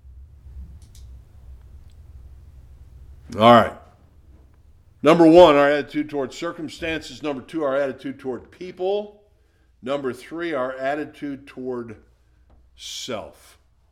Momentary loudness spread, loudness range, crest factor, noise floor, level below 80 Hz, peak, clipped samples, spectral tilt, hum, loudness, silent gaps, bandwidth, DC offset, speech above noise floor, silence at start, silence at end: 22 LU; 13 LU; 22 dB; -58 dBFS; -48 dBFS; 0 dBFS; under 0.1%; -6 dB/octave; none; -20 LUFS; none; 13.5 kHz; under 0.1%; 39 dB; 0.15 s; 0.65 s